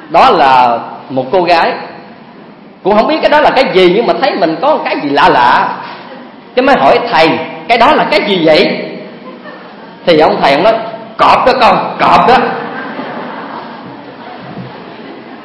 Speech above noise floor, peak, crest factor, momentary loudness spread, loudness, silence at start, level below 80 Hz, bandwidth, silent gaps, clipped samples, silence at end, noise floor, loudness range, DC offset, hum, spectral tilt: 26 dB; 0 dBFS; 10 dB; 21 LU; -9 LUFS; 0 s; -44 dBFS; 11 kHz; none; 1%; 0 s; -34 dBFS; 3 LU; under 0.1%; none; -5.5 dB/octave